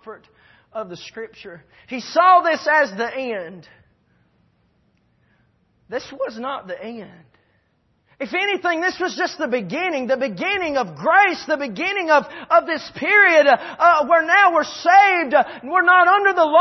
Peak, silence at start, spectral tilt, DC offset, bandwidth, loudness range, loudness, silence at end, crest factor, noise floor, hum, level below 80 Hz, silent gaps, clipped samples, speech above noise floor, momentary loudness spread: -2 dBFS; 0.05 s; -3.5 dB/octave; under 0.1%; 6.2 kHz; 18 LU; -17 LUFS; 0 s; 16 dB; -64 dBFS; none; -64 dBFS; none; under 0.1%; 46 dB; 19 LU